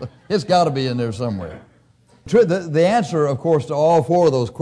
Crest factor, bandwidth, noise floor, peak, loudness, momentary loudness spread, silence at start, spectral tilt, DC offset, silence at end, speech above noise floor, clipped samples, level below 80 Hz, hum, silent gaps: 12 dB; 10.5 kHz; -54 dBFS; -6 dBFS; -18 LUFS; 8 LU; 0 s; -6.5 dB/octave; under 0.1%; 0 s; 36 dB; under 0.1%; -54 dBFS; none; none